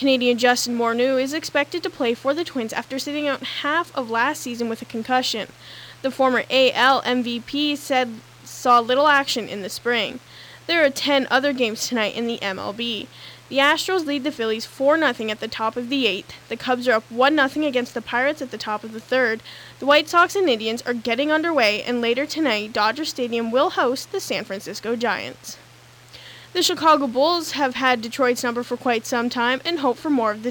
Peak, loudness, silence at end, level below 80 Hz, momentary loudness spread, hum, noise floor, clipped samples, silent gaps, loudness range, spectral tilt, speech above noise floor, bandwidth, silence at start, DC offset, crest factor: -6 dBFS; -21 LUFS; 0 s; -64 dBFS; 11 LU; none; -48 dBFS; under 0.1%; none; 4 LU; -2.5 dB/octave; 26 dB; 19 kHz; 0 s; under 0.1%; 16 dB